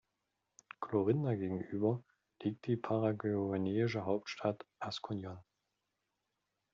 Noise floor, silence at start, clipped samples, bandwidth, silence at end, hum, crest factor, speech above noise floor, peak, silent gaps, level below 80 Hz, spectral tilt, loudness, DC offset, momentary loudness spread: -86 dBFS; 0.8 s; under 0.1%; 7.6 kHz; 1.3 s; none; 20 dB; 50 dB; -18 dBFS; none; -78 dBFS; -6.5 dB/octave; -37 LUFS; under 0.1%; 10 LU